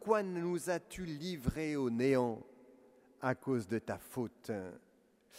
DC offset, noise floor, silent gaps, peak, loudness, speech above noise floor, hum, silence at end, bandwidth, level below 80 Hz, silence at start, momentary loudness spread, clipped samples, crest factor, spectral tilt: under 0.1%; -65 dBFS; none; -16 dBFS; -37 LUFS; 29 dB; none; 0 s; 16 kHz; -58 dBFS; 0 s; 11 LU; under 0.1%; 22 dB; -6 dB/octave